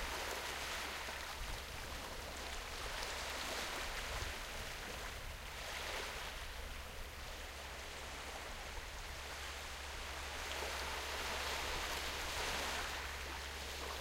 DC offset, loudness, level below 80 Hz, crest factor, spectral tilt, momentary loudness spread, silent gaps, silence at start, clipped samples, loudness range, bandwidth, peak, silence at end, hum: under 0.1%; -43 LUFS; -52 dBFS; 18 dB; -2 dB/octave; 8 LU; none; 0 s; under 0.1%; 6 LU; 16 kHz; -26 dBFS; 0 s; none